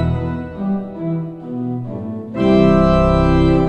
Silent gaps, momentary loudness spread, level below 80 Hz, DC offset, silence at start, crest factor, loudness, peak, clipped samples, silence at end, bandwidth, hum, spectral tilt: none; 14 LU; -26 dBFS; under 0.1%; 0 s; 16 dB; -17 LUFS; 0 dBFS; under 0.1%; 0 s; 8.4 kHz; none; -9 dB/octave